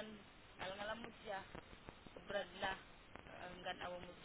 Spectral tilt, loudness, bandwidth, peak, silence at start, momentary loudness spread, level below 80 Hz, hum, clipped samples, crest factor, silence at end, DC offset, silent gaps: -2 dB/octave; -50 LUFS; 4 kHz; -30 dBFS; 0 s; 14 LU; -68 dBFS; none; under 0.1%; 20 dB; 0 s; under 0.1%; none